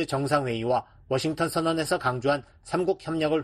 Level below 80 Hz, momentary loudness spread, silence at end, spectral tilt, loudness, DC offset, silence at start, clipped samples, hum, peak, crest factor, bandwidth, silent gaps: -56 dBFS; 4 LU; 0 s; -5.5 dB/octave; -27 LUFS; under 0.1%; 0 s; under 0.1%; none; -10 dBFS; 18 dB; 13.5 kHz; none